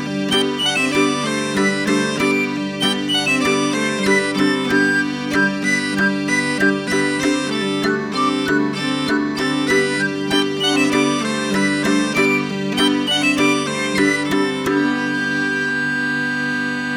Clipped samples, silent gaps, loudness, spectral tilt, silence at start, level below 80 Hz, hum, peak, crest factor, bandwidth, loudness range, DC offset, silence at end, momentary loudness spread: under 0.1%; none; -18 LUFS; -4 dB/octave; 0 s; -52 dBFS; none; -4 dBFS; 14 dB; 16.5 kHz; 2 LU; under 0.1%; 0 s; 4 LU